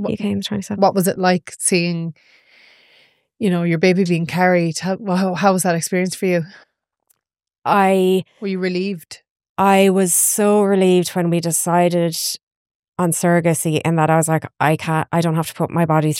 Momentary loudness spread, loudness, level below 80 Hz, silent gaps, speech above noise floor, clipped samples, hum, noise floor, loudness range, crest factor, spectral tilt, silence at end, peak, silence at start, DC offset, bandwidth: 9 LU; -17 LUFS; -64 dBFS; 7.58-7.62 s, 9.30-9.36 s, 9.49-9.55 s, 12.43-12.65 s, 12.75-12.92 s; 63 dB; under 0.1%; none; -80 dBFS; 4 LU; 16 dB; -5 dB/octave; 0 s; -2 dBFS; 0 s; under 0.1%; 16.5 kHz